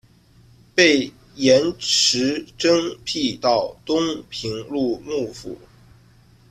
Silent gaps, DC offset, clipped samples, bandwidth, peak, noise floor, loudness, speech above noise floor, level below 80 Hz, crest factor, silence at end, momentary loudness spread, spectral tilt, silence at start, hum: none; under 0.1%; under 0.1%; 14 kHz; -2 dBFS; -52 dBFS; -20 LUFS; 32 dB; -54 dBFS; 20 dB; 0.95 s; 13 LU; -3 dB/octave; 0.75 s; none